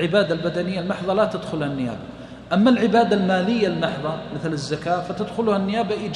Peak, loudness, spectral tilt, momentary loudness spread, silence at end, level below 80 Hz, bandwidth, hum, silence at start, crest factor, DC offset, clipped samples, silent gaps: -6 dBFS; -22 LUFS; -6.5 dB/octave; 10 LU; 0 s; -52 dBFS; 10.5 kHz; none; 0 s; 16 dB; under 0.1%; under 0.1%; none